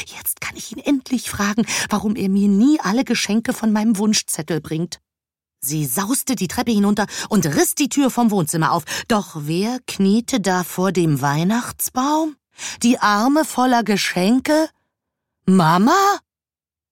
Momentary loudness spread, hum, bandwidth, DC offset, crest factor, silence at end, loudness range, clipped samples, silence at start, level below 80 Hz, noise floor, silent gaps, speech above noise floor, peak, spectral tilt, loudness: 9 LU; none; 17 kHz; under 0.1%; 16 dB; 0.75 s; 3 LU; under 0.1%; 0 s; -54 dBFS; under -90 dBFS; none; over 72 dB; -4 dBFS; -4.5 dB/octave; -19 LUFS